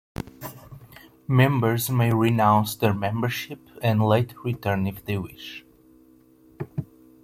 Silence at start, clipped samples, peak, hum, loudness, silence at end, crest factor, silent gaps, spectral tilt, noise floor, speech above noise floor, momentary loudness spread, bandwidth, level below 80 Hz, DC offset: 0.2 s; under 0.1%; -6 dBFS; none; -23 LUFS; 0.4 s; 20 dB; none; -6.5 dB/octave; -55 dBFS; 32 dB; 19 LU; 16.5 kHz; -56 dBFS; under 0.1%